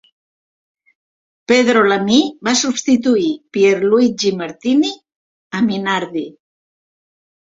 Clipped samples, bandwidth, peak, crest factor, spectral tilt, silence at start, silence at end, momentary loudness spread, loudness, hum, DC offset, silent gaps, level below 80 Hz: under 0.1%; 7.8 kHz; 0 dBFS; 16 dB; -4 dB/octave; 1.5 s; 1.25 s; 12 LU; -15 LUFS; none; under 0.1%; 5.16-5.50 s; -60 dBFS